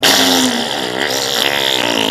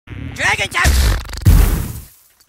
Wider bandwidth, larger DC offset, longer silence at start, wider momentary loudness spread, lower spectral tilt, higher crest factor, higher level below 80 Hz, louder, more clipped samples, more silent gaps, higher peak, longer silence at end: about the same, 16 kHz vs 16.5 kHz; neither; about the same, 0 s vs 0.05 s; second, 7 LU vs 15 LU; second, -1.5 dB/octave vs -4 dB/octave; about the same, 14 dB vs 14 dB; second, -54 dBFS vs -18 dBFS; about the same, -13 LUFS vs -15 LUFS; neither; neither; about the same, 0 dBFS vs 0 dBFS; second, 0 s vs 0.45 s